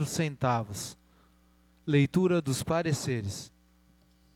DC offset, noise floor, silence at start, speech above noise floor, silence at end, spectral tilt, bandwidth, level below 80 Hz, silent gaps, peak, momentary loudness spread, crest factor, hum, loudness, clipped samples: under 0.1%; -63 dBFS; 0 s; 35 dB; 0.9 s; -5.5 dB/octave; 16.5 kHz; -58 dBFS; none; -12 dBFS; 16 LU; 18 dB; none; -29 LUFS; under 0.1%